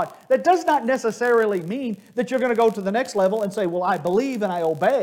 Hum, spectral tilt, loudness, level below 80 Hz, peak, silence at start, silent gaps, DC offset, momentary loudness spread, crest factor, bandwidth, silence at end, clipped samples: none; -5.5 dB/octave; -21 LUFS; -68 dBFS; -6 dBFS; 0 s; none; under 0.1%; 7 LU; 14 dB; 17 kHz; 0 s; under 0.1%